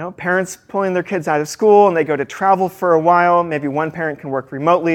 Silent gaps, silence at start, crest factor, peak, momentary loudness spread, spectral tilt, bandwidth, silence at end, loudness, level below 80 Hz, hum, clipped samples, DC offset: none; 0 s; 16 dB; 0 dBFS; 10 LU; -6 dB/octave; 16.5 kHz; 0 s; -16 LUFS; -62 dBFS; none; under 0.1%; under 0.1%